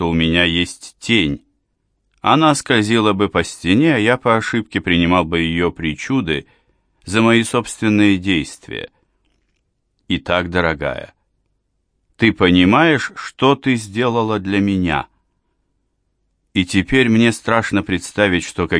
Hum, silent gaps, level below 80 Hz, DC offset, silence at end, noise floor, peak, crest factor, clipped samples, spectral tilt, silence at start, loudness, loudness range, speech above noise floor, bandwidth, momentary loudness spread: none; none; -42 dBFS; under 0.1%; 0 s; -68 dBFS; 0 dBFS; 18 dB; under 0.1%; -5 dB/octave; 0 s; -16 LUFS; 5 LU; 52 dB; 10.5 kHz; 10 LU